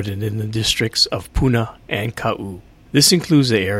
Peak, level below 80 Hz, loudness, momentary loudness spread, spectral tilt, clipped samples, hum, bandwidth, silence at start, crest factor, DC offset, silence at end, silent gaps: 0 dBFS; -34 dBFS; -18 LUFS; 11 LU; -4 dB/octave; under 0.1%; none; 16.5 kHz; 0 s; 18 dB; under 0.1%; 0 s; none